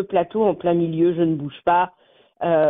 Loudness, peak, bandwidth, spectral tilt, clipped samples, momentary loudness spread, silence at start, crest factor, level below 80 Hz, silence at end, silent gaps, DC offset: -21 LUFS; -6 dBFS; 3.9 kHz; -6.5 dB/octave; under 0.1%; 5 LU; 0 s; 14 dB; -58 dBFS; 0 s; none; under 0.1%